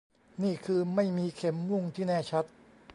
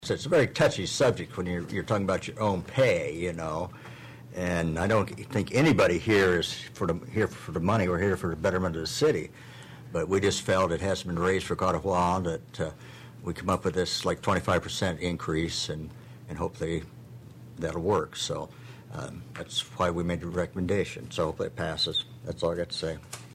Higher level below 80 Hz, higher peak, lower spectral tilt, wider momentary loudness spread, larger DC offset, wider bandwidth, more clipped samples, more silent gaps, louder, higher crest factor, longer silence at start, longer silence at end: second, -70 dBFS vs -52 dBFS; about the same, -16 dBFS vs -14 dBFS; first, -7.5 dB/octave vs -5 dB/octave; second, 5 LU vs 15 LU; neither; second, 11 kHz vs 15.5 kHz; neither; neither; second, -31 LUFS vs -28 LUFS; about the same, 16 dB vs 14 dB; first, 0.4 s vs 0 s; about the same, 0 s vs 0 s